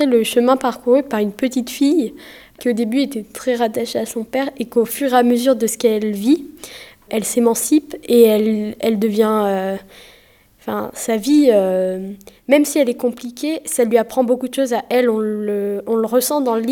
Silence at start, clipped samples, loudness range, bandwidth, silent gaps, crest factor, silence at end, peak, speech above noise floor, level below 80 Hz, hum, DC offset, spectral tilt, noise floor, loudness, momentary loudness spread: 0 s; under 0.1%; 3 LU; over 20 kHz; none; 18 dB; 0 s; 0 dBFS; 34 dB; -58 dBFS; none; under 0.1%; -4.5 dB/octave; -51 dBFS; -17 LUFS; 11 LU